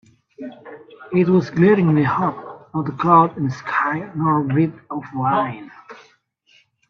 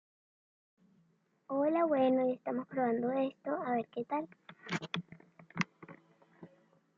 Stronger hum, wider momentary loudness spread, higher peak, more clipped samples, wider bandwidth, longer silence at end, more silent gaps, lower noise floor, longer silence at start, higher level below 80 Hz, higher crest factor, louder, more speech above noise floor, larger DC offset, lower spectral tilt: neither; about the same, 21 LU vs 19 LU; first, -2 dBFS vs -14 dBFS; neither; second, 6.6 kHz vs 7.6 kHz; first, 0.95 s vs 0.5 s; neither; second, -58 dBFS vs -73 dBFS; second, 0.4 s vs 1.5 s; first, -60 dBFS vs -82 dBFS; about the same, 18 dB vs 22 dB; first, -18 LUFS vs -34 LUFS; about the same, 40 dB vs 40 dB; neither; first, -9 dB/octave vs -6.5 dB/octave